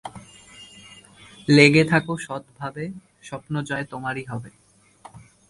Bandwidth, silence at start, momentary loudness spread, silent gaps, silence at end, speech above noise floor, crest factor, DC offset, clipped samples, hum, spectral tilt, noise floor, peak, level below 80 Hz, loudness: 11.5 kHz; 0.05 s; 28 LU; none; 0.3 s; 28 dB; 24 dB; under 0.1%; under 0.1%; none; -5.5 dB/octave; -50 dBFS; 0 dBFS; -58 dBFS; -20 LUFS